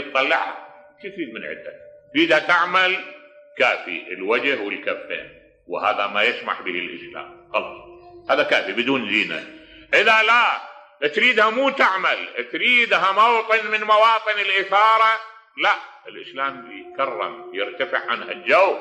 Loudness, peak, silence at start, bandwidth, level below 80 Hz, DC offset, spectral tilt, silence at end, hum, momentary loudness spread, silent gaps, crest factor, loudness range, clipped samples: -19 LUFS; -4 dBFS; 0 s; 12.5 kHz; -68 dBFS; under 0.1%; -3 dB/octave; 0 s; none; 18 LU; none; 18 dB; 7 LU; under 0.1%